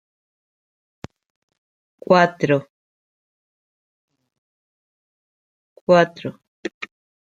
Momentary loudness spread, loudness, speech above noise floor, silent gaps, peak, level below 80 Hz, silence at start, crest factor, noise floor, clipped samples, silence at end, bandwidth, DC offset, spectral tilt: 20 LU; -18 LUFS; over 73 dB; 2.70-4.08 s, 4.38-5.87 s, 6.48-6.63 s, 6.74-6.81 s; -2 dBFS; -66 dBFS; 2.1 s; 22 dB; under -90 dBFS; under 0.1%; 0.45 s; 7.6 kHz; under 0.1%; -6.5 dB/octave